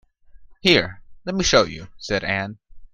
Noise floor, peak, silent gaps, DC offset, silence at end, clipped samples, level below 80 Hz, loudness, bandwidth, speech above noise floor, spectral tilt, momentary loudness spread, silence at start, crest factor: -45 dBFS; 0 dBFS; none; under 0.1%; 0.1 s; under 0.1%; -44 dBFS; -20 LUFS; 14 kHz; 25 dB; -3.5 dB/octave; 16 LU; 0.4 s; 22 dB